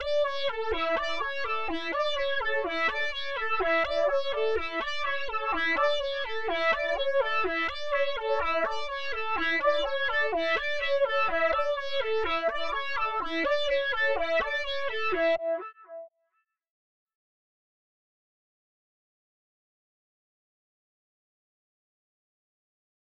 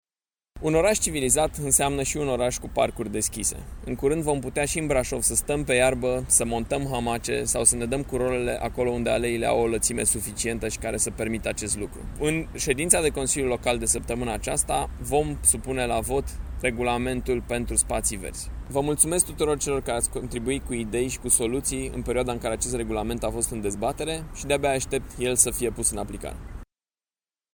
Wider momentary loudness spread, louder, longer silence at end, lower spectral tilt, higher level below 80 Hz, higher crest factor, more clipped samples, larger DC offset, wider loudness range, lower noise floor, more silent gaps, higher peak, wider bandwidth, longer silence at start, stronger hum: second, 5 LU vs 8 LU; second, -28 LUFS vs -24 LUFS; first, 6.95 s vs 0.9 s; about the same, -3 dB/octave vs -3.5 dB/octave; second, -52 dBFS vs -38 dBFS; second, 14 dB vs 24 dB; neither; neither; about the same, 3 LU vs 3 LU; second, -77 dBFS vs under -90 dBFS; neither; second, -14 dBFS vs -2 dBFS; second, 8 kHz vs 19.5 kHz; second, 0 s vs 0.55 s; neither